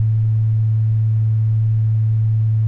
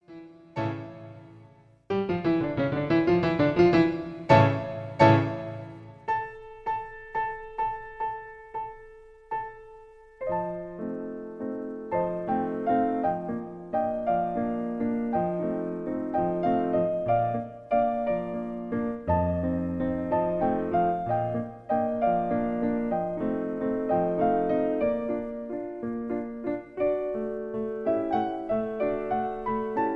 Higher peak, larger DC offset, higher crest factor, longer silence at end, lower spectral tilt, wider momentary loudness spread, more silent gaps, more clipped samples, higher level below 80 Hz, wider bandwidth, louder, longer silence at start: second, -10 dBFS vs -6 dBFS; neither; second, 6 dB vs 22 dB; about the same, 0 s vs 0 s; first, -11.5 dB/octave vs -9 dB/octave; second, 0 LU vs 12 LU; neither; neither; first, -40 dBFS vs -52 dBFS; second, 0.9 kHz vs 7.6 kHz; first, -17 LUFS vs -28 LUFS; about the same, 0 s vs 0.1 s